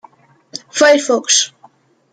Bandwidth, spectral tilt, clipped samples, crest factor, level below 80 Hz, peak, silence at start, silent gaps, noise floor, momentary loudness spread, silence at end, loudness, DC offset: 10.5 kHz; 0 dB/octave; under 0.1%; 16 dB; -70 dBFS; 0 dBFS; 0.55 s; none; -49 dBFS; 19 LU; 0.65 s; -13 LUFS; under 0.1%